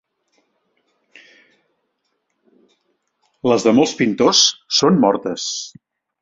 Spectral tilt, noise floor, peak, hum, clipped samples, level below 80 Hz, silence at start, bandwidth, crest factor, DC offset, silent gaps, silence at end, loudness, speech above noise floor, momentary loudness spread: -3.5 dB/octave; -71 dBFS; -2 dBFS; none; under 0.1%; -62 dBFS; 3.45 s; 7.8 kHz; 18 dB; under 0.1%; none; 0.55 s; -16 LUFS; 55 dB; 12 LU